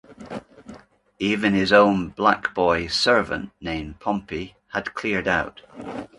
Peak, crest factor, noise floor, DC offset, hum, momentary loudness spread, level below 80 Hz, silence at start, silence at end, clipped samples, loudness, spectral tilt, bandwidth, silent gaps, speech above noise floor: -2 dBFS; 22 dB; -47 dBFS; under 0.1%; none; 19 LU; -48 dBFS; 0.1 s; 0.1 s; under 0.1%; -22 LUFS; -5 dB/octave; 11.5 kHz; none; 25 dB